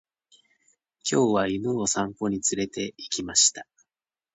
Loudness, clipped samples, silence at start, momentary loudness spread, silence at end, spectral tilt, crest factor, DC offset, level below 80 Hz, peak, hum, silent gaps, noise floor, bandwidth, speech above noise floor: -24 LUFS; under 0.1%; 1.05 s; 12 LU; 0.7 s; -2.5 dB/octave; 22 dB; under 0.1%; -60 dBFS; -6 dBFS; none; none; under -90 dBFS; 9.2 kHz; over 65 dB